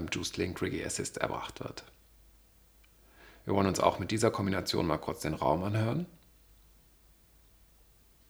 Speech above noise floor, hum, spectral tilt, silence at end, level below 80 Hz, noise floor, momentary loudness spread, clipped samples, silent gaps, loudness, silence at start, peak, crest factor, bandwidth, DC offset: 29 dB; none; -5 dB/octave; 2.15 s; -58 dBFS; -61 dBFS; 13 LU; under 0.1%; none; -32 LUFS; 0 s; -8 dBFS; 26 dB; over 20 kHz; under 0.1%